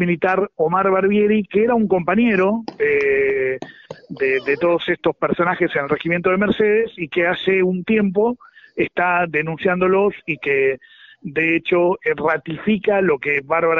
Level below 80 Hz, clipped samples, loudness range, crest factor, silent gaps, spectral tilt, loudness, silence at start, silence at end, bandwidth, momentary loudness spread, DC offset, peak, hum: -54 dBFS; under 0.1%; 2 LU; 14 dB; none; -4.5 dB/octave; -18 LUFS; 0 s; 0 s; 6.6 kHz; 6 LU; under 0.1%; -4 dBFS; none